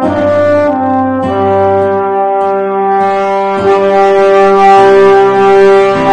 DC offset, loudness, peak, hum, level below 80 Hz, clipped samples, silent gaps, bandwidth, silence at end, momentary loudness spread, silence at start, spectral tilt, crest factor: under 0.1%; -8 LUFS; 0 dBFS; none; -44 dBFS; 2%; none; 9.2 kHz; 0 s; 7 LU; 0 s; -6.5 dB/octave; 8 dB